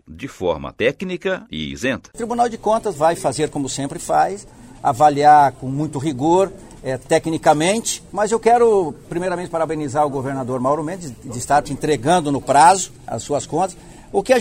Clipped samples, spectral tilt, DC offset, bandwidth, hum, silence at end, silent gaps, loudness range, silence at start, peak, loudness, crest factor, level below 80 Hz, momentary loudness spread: under 0.1%; -4.5 dB/octave; under 0.1%; 16 kHz; none; 0 s; none; 4 LU; 0.1 s; -2 dBFS; -18 LUFS; 18 dB; -46 dBFS; 12 LU